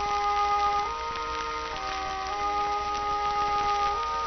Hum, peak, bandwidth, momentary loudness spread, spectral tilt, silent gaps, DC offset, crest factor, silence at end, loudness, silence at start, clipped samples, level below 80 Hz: none; -14 dBFS; 6.6 kHz; 6 LU; -0.5 dB/octave; none; under 0.1%; 14 dB; 0 s; -28 LUFS; 0 s; under 0.1%; -46 dBFS